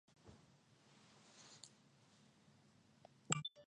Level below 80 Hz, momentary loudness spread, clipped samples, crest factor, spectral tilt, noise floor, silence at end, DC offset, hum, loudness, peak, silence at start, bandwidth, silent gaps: -82 dBFS; 27 LU; under 0.1%; 34 dB; -2.5 dB/octave; -71 dBFS; 0 s; under 0.1%; none; -47 LUFS; -20 dBFS; 0.1 s; 10.5 kHz; none